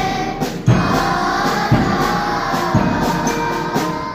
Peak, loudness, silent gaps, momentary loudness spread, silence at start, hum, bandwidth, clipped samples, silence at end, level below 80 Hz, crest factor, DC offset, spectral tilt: -2 dBFS; -17 LUFS; none; 5 LU; 0 s; none; 16 kHz; under 0.1%; 0 s; -34 dBFS; 16 dB; under 0.1%; -5.5 dB/octave